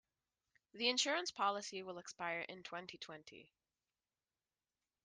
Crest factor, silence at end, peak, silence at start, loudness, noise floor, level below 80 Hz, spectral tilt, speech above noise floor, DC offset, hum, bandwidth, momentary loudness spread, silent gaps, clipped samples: 24 dB; 1.6 s; -22 dBFS; 0.75 s; -40 LUFS; under -90 dBFS; -88 dBFS; -1.5 dB/octave; over 48 dB; under 0.1%; none; 10 kHz; 16 LU; none; under 0.1%